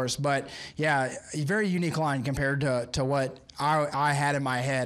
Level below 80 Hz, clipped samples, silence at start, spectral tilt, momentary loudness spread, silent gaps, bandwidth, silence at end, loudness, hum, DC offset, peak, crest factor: -54 dBFS; under 0.1%; 0 s; -5 dB/octave; 5 LU; none; 13.5 kHz; 0 s; -28 LUFS; none; under 0.1%; -12 dBFS; 14 dB